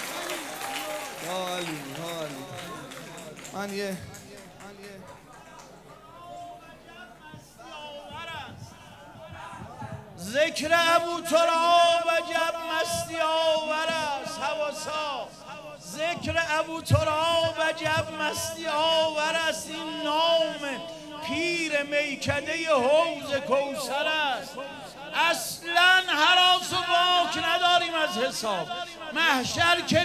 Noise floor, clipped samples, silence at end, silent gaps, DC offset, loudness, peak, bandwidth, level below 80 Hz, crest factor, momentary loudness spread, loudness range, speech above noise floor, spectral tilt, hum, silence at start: -48 dBFS; under 0.1%; 0 s; none; under 0.1%; -25 LUFS; -6 dBFS; 16 kHz; -54 dBFS; 22 dB; 21 LU; 20 LU; 23 dB; -3 dB/octave; none; 0 s